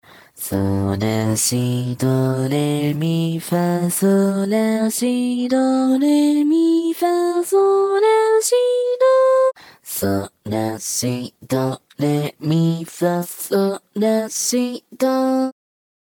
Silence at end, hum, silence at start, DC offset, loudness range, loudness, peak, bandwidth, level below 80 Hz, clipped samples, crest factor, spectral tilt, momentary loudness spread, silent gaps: 0.5 s; none; 0.35 s; under 0.1%; 5 LU; -18 LUFS; -6 dBFS; over 20 kHz; -60 dBFS; under 0.1%; 12 dB; -5.5 dB/octave; 8 LU; none